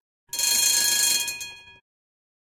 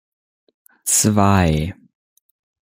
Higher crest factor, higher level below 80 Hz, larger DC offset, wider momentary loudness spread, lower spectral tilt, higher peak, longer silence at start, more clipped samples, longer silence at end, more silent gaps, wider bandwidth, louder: about the same, 20 dB vs 18 dB; second, -66 dBFS vs -40 dBFS; neither; about the same, 15 LU vs 13 LU; second, 3 dB/octave vs -4.5 dB/octave; second, -6 dBFS vs -2 dBFS; second, 0.35 s vs 0.85 s; neither; second, 0.7 s vs 0.95 s; neither; about the same, 17 kHz vs 16.5 kHz; second, -20 LUFS vs -17 LUFS